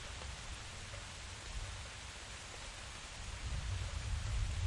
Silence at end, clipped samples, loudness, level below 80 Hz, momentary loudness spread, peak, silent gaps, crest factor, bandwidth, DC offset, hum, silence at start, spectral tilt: 0 s; under 0.1%; -45 LUFS; -46 dBFS; 6 LU; -26 dBFS; none; 18 dB; 11.5 kHz; under 0.1%; none; 0 s; -3 dB/octave